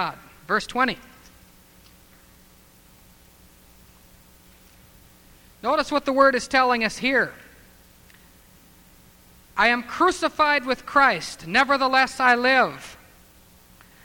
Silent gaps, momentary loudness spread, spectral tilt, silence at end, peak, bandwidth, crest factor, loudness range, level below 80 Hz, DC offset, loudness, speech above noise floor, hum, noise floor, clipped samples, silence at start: none; 11 LU; -3 dB/octave; 1.1 s; -4 dBFS; 20 kHz; 22 dB; 10 LU; -54 dBFS; under 0.1%; -21 LUFS; 32 dB; none; -53 dBFS; under 0.1%; 0 s